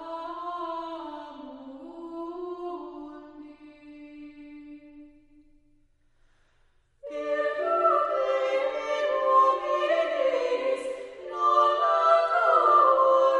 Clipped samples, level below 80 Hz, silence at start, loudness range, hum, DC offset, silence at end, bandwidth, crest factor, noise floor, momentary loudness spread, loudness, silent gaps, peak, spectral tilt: under 0.1%; -66 dBFS; 0 s; 19 LU; none; under 0.1%; 0 s; 11 kHz; 18 dB; -64 dBFS; 23 LU; -24 LUFS; none; -10 dBFS; -3 dB/octave